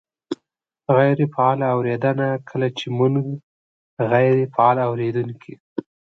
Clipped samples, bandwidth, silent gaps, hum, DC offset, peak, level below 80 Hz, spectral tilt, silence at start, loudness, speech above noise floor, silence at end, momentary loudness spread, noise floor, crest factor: under 0.1%; 7.4 kHz; 3.43-3.97 s, 5.60-5.76 s; none; under 0.1%; -2 dBFS; -66 dBFS; -8.5 dB/octave; 0.3 s; -20 LUFS; 59 dB; 0.35 s; 16 LU; -78 dBFS; 18 dB